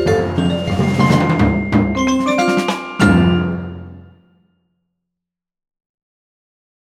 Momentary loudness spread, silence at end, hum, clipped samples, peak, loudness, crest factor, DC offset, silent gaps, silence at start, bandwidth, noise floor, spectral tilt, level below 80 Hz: 8 LU; 2.95 s; none; under 0.1%; 0 dBFS; -16 LUFS; 18 dB; under 0.1%; none; 0 s; 13.5 kHz; -83 dBFS; -6.5 dB/octave; -36 dBFS